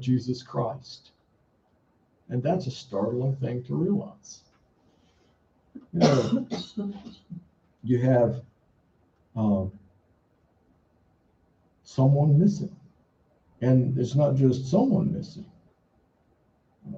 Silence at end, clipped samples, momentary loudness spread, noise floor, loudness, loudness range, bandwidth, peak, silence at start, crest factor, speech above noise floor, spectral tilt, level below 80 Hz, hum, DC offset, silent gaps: 0 s; under 0.1%; 21 LU; -67 dBFS; -25 LUFS; 7 LU; 7.6 kHz; -8 dBFS; 0 s; 20 dB; 42 dB; -8 dB/octave; -62 dBFS; none; under 0.1%; none